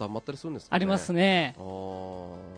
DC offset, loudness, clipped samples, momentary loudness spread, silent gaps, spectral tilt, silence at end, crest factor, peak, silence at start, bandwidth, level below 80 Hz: under 0.1%; -28 LUFS; under 0.1%; 15 LU; none; -5.5 dB/octave; 0 s; 20 dB; -8 dBFS; 0 s; 10 kHz; -62 dBFS